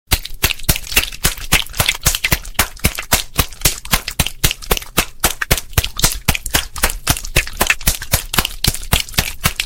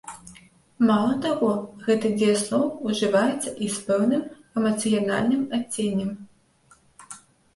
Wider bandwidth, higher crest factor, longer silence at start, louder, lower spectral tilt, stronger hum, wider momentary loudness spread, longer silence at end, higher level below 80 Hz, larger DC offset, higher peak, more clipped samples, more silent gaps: first, 17 kHz vs 11.5 kHz; about the same, 18 dB vs 16 dB; about the same, 0.1 s vs 0.05 s; first, -16 LUFS vs -24 LUFS; second, -2 dB/octave vs -5 dB/octave; neither; second, 4 LU vs 18 LU; second, 0 s vs 0.4 s; first, -24 dBFS vs -62 dBFS; neither; first, 0 dBFS vs -8 dBFS; neither; neither